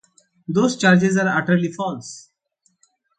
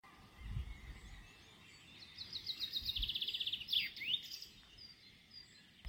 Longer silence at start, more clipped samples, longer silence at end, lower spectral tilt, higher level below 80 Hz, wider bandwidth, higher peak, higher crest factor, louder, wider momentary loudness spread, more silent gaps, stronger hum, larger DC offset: first, 0.5 s vs 0.05 s; neither; first, 1 s vs 0 s; first, -5.5 dB/octave vs -2 dB/octave; second, -64 dBFS vs -56 dBFS; second, 9.2 kHz vs 16.5 kHz; first, -2 dBFS vs -24 dBFS; about the same, 18 dB vs 22 dB; first, -19 LUFS vs -40 LUFS; about the same, 22 LU vs 22 LU; neither; neither; neither